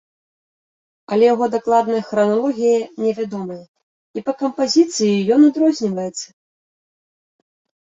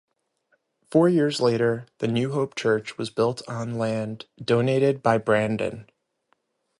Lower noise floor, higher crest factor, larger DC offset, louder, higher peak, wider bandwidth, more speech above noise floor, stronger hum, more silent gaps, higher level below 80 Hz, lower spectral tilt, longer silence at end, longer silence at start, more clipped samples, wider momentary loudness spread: first, under -90 dBFS vs -71 dBFS; about the same, 16 dB vs 20 dB; neither; first, -17 LUFS vs -24 LUFS; first, -2 dBFS vs -6 dBFS; second, 8 kHz vs 11.5 kHz; first, over 73 dB vs 48 dB; neither; first, 3.68-3.74 s, 3.83-4.14 s vs none; about the same, -66 dBFS vs -62 dBFS; second, -5 dB/octave vs -6.5 dB/octave; first, 1.7 s vs 0.95 s; first, 1.1 s vs 0.9 s; neither; first, 15 LU vs 11 LU